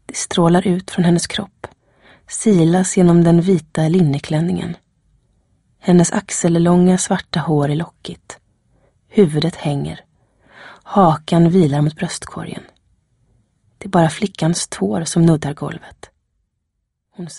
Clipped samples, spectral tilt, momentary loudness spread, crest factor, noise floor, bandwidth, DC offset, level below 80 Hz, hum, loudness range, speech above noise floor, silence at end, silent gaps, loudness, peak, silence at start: under 0.1%; -6 dB/octave; 18 LU; 16 dB; -73 dBFS; 11.5 kHz; under 0.1%; -48 dBFS; none; 5 LU; 58 dB; 0 s; none; -16 LUFS; 0 dBFS; 0.1 s